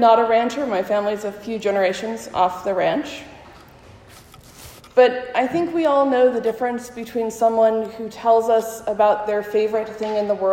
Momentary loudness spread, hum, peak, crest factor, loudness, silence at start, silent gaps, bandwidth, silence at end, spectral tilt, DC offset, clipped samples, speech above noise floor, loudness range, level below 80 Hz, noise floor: 11 LU; none; -2 dBFS; 18 dB; -20 LUFS; 0 s; none; 16 kHz; 0 s; -4.5 dB/octave; under 0.1%; under 0.1%; 26 dB; 5 LU; -58 dBFS; -45 dBFS